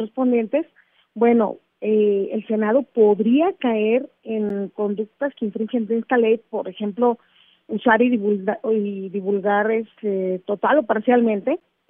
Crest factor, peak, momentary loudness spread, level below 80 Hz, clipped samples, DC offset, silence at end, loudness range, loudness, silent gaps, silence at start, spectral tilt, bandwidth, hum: 16 dB; -4 dBFS; 9 LU; -74 dBFS; under 0.1%; under 0.1%; 0.35 s; 3 LU; -21 LUFS; none; 0 s; -10.5 dB/octave; 3.7 kHz; none